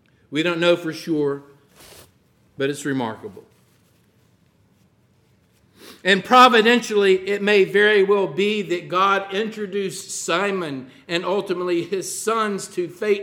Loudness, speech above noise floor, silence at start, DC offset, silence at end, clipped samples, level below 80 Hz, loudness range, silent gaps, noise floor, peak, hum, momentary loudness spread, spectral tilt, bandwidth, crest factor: -20 LUFS; 40 dB; 0.3 s; under 0.1%; 0 s; under 0.1%; -70 dBFS; 15 LU; none; -59 dBFS; -2 dBFS; none; 12 LU; -4 dB/octave; 16.5 kHz; 20 dB